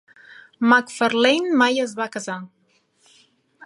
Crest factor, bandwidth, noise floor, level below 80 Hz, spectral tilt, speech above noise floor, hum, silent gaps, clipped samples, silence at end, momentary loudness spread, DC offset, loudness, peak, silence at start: 20 dB; 11.5 kHz; -63 dBFS; -74 dBFS; -3.5 dB/octave; 43 dB; none; none; under 0.1%; 1.2 s; 13 LU; under 0.1%; -19 LUFS; -2 dBFS; 0.6 s